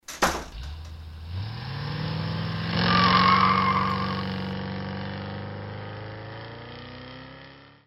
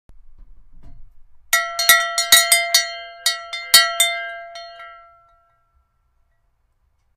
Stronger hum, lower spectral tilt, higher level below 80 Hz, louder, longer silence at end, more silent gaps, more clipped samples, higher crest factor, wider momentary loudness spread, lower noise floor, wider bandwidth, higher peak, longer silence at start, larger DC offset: neither; first, -5 dB/octave vs 3 dB/octave; about the same, -46 dBFS vs -50 dBFS; second, -25 LUFS vs -15 LUFS; second, 0.15 s vs 2.25 s; neither; neither; about the same, 22 dB vs 22 dB; about the same, 22 LU vs 21 LU; second, -48 dBFS vs -64 dBFS; about the same, 15.5 kHz vs 16 kHz; second, -6 dBFS vs 0 dBFS; about the same, 0.1 s vs 0.1 s; neither